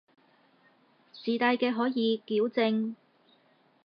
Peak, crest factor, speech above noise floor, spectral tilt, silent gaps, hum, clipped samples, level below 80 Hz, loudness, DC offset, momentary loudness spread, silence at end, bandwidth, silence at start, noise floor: -12 dBFS; 20 dB; 38 dB; -7.5 dB/octave; none; none; under 0.1%; -88 dBFS; -29 LUFS; under 0.1%; 11 LU; 0.9 s; 5.4 kHz; 1.15 s; -66 dBFS